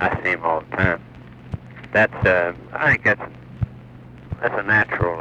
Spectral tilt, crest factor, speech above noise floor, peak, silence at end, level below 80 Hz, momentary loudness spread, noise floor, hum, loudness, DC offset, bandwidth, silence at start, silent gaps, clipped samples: -7.5 dB/octave; 20 dB; 21 dB; -2 dBFS; 0 s; -42 dBFS; 18 LU; -41 dBFS; none; -20 LUFS; under 0.1%; 8.6 kHz; 0 s; none; under 0.1%